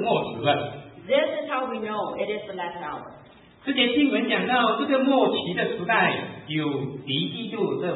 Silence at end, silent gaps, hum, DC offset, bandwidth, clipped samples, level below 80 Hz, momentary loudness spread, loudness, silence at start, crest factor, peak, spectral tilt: 0 s; none; none; under 0.1%; 4.1 kHz; under 0.1%; -66 dBFS; 12 LU; -24 LUFS; 0 s; 18 dB; -8 dBFS; -10 dB/octave